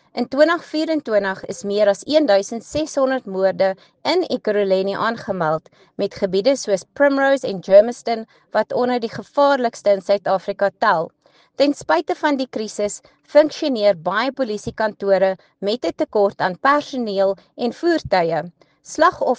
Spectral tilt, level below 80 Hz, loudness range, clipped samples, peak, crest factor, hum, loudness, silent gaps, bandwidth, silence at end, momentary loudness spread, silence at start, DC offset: -4.5 dB/octave; -58 dBFS; 2 LU; under 0.1%; 0 dBFS; 18 dB; none; -19 LUFS; none; 9.4 kHz; 0 s; 9 LU; 0.15 s; under 0.1%